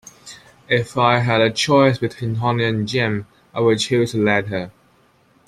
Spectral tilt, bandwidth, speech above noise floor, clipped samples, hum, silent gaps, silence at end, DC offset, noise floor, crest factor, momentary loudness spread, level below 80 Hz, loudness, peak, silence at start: -5.5 dB/octave; 13 kHz; 38 dB; under 0.1%; none; none; 0.75 s; under 0.1%; -56 dBFS; 18 dB; 13 LU; -54 dBFS; -18 LUFS; -2 dBFS; 0.25 s